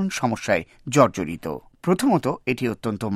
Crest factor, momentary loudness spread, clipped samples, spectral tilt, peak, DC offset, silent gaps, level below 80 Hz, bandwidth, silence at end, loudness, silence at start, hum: 20 dB; 10 LU; under 0.1%; -5.5 dB/octave; -2 dBFS; under 0.1%; none; -54 dBFS; 15 kHz; 0 s; -23 LUFS; 0 s; none